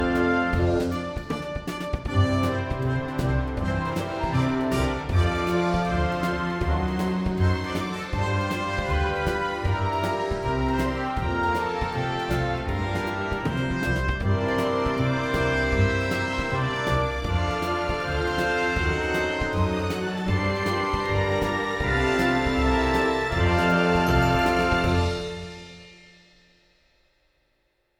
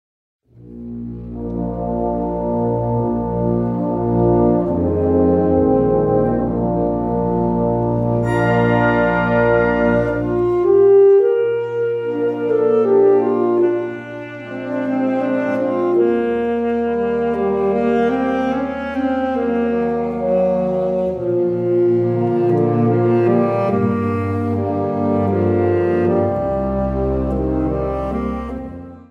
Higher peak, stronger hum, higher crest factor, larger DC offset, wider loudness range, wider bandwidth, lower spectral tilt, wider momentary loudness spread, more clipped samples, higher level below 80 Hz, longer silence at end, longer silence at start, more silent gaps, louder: second, -10 dBFS vs -2 dBFS; neither; about the same, 16 dB vs 14 dB; neither; about the same, 4 LU vs 5 LU; first, 19.5 kHz vs 6 kHz; second, -6.5 dB/octave vs -10 dB/octave; about the same, 6 LU vs 8 LU; neither; about the same, -34 dBFS vs -36 dBFS; first, 2.05 s vs 0.1 s; second, 0 s vs 0.6 s; neither; second, -25 LUFS vs -17 LUFS